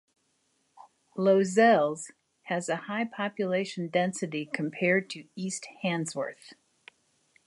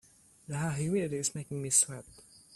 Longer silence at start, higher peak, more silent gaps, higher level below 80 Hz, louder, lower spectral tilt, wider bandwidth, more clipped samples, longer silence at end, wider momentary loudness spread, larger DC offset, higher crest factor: first, 1.15 s vs 0.5 s; about the same, -10 dBFS vs -12 dBFS; neither; second, -80 dBFS vs -66 dBFS; first, -28 LUFS vs -31 LUFS; about the same, -5 dB/octave vs -4 dB/octave; second, 11.5 kHz vs 15 kHz; neither; first, 0.95 s vs 0 s; about the same, 15 LU vs 13 LU; neither; about the same, 20 dB vs 22 dB